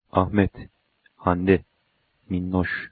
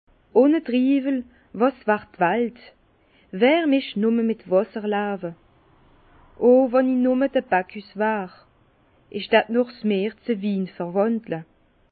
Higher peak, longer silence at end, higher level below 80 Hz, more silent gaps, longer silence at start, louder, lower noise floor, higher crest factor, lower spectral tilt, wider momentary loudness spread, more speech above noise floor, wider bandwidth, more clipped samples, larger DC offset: about the same, -2 dBFS vs -4 dBFS; second, 0.05 s vs 0.5 s; first, -46 dBFS vs -62 dBFS; neither; second, 0.15 s vs 0.35 s; about the same, -24 LUFS vs -22 LUFS; first, -69 dBFS vs -59 dBFS; about the same, 22 dB vs 20 dB; about the same, -11.5 dB/octave vs -10.5 dB/octave; second, 9 LU vs 13 LU; first, 47 dB vs 38 dB; about the same, 4.7 kHz vs 4.7 kHz; neither; neither